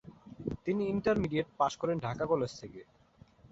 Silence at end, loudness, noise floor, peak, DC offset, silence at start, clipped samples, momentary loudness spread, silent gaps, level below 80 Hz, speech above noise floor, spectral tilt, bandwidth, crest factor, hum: 0.05 s; -33 LUFS; -60 dBFS; -16 dBFS; under 0.1%; 0.05 s; under 0.1%; 18 LU; none; -58 dBFS; 28 dB; -6.5 dB/octave; 8 kHz; 18 dB; none